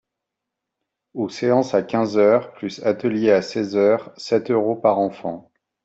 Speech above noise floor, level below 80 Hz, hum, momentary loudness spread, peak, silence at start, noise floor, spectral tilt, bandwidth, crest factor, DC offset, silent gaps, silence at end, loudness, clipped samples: 63 dB; -66 dBFS; none; 12 LU; -4 dBFS; 1.15 s; -83 dBFS; -6.5 dB/octave; 8 kHz; 18 dB; under 0.1%; none; 0.45 s; -20 LUFS; under 0.1%